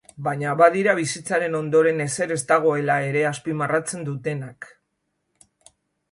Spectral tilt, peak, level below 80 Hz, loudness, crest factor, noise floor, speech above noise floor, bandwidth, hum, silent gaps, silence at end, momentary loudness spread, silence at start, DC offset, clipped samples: -5 dB/octave; -2 dBFS; -68 dBFS; -22 LUFS; 20 dB; -75 dBFS; 53 dB; 11.5 kHz; none; none; 1.45 s; 12 LU; 0.2 s; under 0.1%; under 0.1%